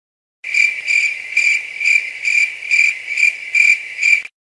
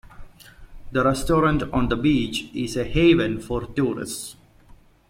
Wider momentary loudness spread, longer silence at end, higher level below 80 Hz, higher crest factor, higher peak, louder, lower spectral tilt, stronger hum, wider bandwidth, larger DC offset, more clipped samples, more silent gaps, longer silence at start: second, 4 LU vs 11 LU; second, 0.15 s vs 0.8 s; second, -72 dBFS vs -38 dBFS; about the same, 16 dB vs 18 dB; first, 0 dBFS vs -6 dBFS; first, -13 LUFS vs -22 LUFS; second, 3.5 dB/octave vs -5.5 dB/octave; neither; second, 12 kHz vs 16.5 kHz; neither; neither; neither; first, 0.45 s vs 0.2 s